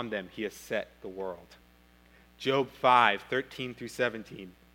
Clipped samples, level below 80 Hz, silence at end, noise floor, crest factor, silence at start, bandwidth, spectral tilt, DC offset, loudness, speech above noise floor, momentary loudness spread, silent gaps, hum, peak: under 0.1%; -64 dBFS; 0.25 s; -60 dBFS; 24 dB; 0 s; 17 kHz; -4.5 dB/octave; under 0.1%; -30 LUFS; 29 dB; 20 LU; none; 60 Hz at -60 dBFS; -8 dBFS